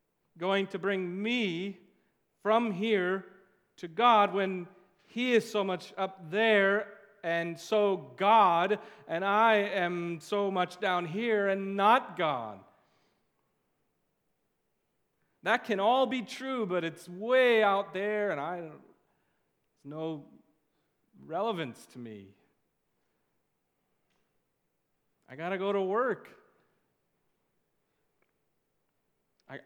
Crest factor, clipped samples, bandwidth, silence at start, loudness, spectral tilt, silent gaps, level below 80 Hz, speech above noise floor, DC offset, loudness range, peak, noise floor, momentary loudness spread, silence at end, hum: 22 dB; under 0.1%; 15.5 kHz; 0.35 s; -29 LUFS; -5.5 dB/octave; none; -88 dBFS; 50 dB; under 0.1%; 13 LU; -10 dBFS; -80 dBFS; 16 LU; 0.1 s; none